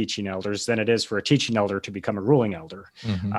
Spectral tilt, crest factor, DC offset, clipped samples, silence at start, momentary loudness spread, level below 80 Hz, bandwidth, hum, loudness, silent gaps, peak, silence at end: -5 dB/octave; 20 dB; under 0.1%; under 0.1%; 0 s; 10 LU; -52 dBFS; 12.5 kHz; none; -24 LUFS; none; -6 dBFS; 0 s